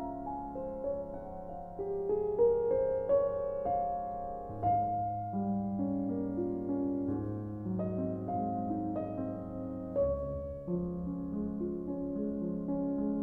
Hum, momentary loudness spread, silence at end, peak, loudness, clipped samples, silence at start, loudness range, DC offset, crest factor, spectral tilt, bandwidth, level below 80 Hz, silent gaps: none; 10 LU; 0 s; -18 dBFS; -35 LUFS; under 0.1%; 0 s; 4 LU; under 0.1%; 16 dB; -12.5 dB/octave; 3 kHz; -52 dBFS; none